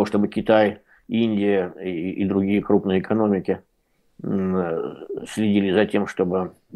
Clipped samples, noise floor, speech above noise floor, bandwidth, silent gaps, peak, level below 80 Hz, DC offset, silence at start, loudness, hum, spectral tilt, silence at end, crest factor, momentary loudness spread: under 0.1%; -65 dBFS; 44 dB; 12 kHz; none; -4 dBFS; -60 dBFS; under 0.1%; 0 s; -22 LUFS; none; -7.5 dB/octave; 0 s; 18 dB; 10 LU